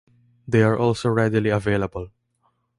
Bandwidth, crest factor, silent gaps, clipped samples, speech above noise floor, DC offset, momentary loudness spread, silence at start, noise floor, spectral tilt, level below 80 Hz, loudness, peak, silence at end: 11.5 kHz; 18 dB; none; under 0.1%; 48 dB; under 0.1%; 12 LU; 0.45 s; -69 dBFS; -7.5 dB/octave; -48 dBFS; -21 LUFS; -6 dBFS; 0.7 s